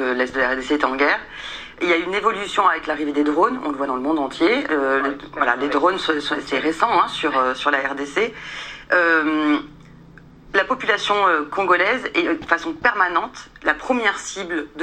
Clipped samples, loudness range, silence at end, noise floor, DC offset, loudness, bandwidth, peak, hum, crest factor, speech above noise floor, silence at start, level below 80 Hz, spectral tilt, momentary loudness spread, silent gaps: under 0.1%; 2 LU; 0 s; -45 dBFS; under 0.1%; -20 LUFS; 9.6 kHz; 0 dBFS; none; 20 dB; 24 dB; 0 s; -52 dBFS; -3.5 dB/octave; 8 LU; none